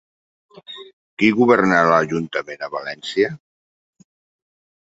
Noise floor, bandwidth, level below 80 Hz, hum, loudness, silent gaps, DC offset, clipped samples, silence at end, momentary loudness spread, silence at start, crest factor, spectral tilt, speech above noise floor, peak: under -90 dBFS; 8 kHz; -60 dBFS; none; -18 LUFS; 0.93-1.17 s; under 0.1%; under 0.1%; 1.6 s; 23 LU; 0.7 s; 20 dB; -6 dB/octave; over 72 dB; -2 dBFS